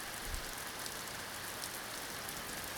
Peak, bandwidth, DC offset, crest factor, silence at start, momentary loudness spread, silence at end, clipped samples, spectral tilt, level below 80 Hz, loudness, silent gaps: -22 dBFS; over 20 kHz; under 0.1%; 22 dB; 0 s; 1 LU; 0 s; under 0.1%; -1.5 dB/octave; -54 dBFS; -41 LUFS; none